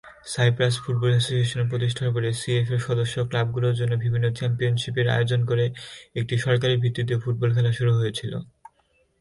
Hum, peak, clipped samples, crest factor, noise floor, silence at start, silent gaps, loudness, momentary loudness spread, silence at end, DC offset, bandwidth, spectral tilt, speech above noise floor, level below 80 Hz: none; -8 dBFS; under 0.1%; 14 dB; -65 dBFS; 0.05 s; none; -24 LUFS; 6 LU; 0.75 s; under 0.1%; 11.5 kHz; -6 dB/octave; 43 dB; -54 dBFS